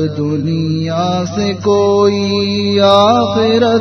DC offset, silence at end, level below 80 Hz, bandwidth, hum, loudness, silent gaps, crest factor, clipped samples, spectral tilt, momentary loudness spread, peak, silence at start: under 0.1%; 0 s; -48 dBFS; 6.6 kHz; none; -13 LUFS; none; 12 dB; under 0.1%; -6 dB/octave; 7 LU; 0 dBFS; 0 s